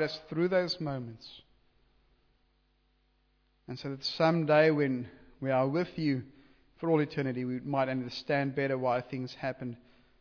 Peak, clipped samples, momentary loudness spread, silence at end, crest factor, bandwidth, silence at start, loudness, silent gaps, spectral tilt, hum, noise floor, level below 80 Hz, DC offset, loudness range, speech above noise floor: -14 dBFS; under 0.1%; 16 LU; 0.45 s; 18 dB; 5.4 kHz; 0 s; -31 LUFS; none; -5 dB/octave; none; -71 dBFS; -68 dBFS; under 0.1%; 8 LU; 41 dB